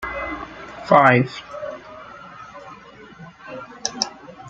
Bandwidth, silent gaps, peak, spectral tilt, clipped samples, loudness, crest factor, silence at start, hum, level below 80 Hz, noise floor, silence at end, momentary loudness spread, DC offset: 8.6 kHz; none; -2 dBFS; -4.5 dB/octave; under 0.1%; -20 LUFS; 22 dB; 0 s; none; -52 dBFS; -43 dBFS; 0 s; 26 LU; under 0.1%